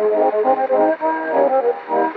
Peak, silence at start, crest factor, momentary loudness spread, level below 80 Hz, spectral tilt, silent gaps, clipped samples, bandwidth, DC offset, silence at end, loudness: -4 dBFS; 0 s; 12 dB; 4 LU; -76 dBFS; -8 dB/octave; none; under 0.1%; 4.8 kHz; under 0.1%; 0 s; -17 LUFS